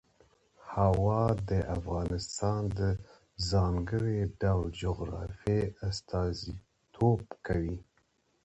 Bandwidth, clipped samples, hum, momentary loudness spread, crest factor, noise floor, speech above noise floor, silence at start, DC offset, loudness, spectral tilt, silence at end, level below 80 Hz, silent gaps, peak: 8.2 kHz; under 0.1%; none; 10 LU; 20 dB; -72 dBFS; 42 dB; 0.65 s; under 0.1%; -32 LUFS; -7 dB/octave; 0.65 s; -44 dBFS; none; -12 dBFS